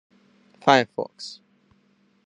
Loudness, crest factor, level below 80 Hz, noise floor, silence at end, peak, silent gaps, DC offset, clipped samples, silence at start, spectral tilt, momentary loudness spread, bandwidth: -22 LUFS; 26 dB; -72 dBFS; -63 dBFS; 0.9 s; -2 dBFS; none; under 0.1%; under 0.1%; 0.65 s; -4.5 dB/octave; 19 LU; 10.5 kHz